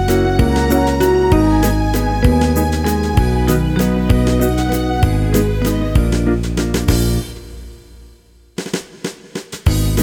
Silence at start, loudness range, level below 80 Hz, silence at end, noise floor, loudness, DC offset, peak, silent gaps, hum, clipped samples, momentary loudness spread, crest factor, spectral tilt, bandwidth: 0 s; 7 LU; -20 dBFS; 0 s; -46 dBFS; -16 LUFS; under 0.1%; 0 dBFS; none; none; under 0.1%; 14 LU; 14 dB; -6.5 dB/octave; over 20 kHz